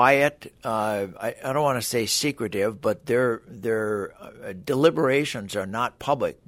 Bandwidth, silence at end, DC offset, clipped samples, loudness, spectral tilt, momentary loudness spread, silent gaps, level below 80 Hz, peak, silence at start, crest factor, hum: 16 kHz; 0.15 s; under 0.1%; under 0.1%; -25 LUFS; -4 dB/octave; 10 LU; none; -60 dBFS; -4 dBFS; 0 s; 20 dB; none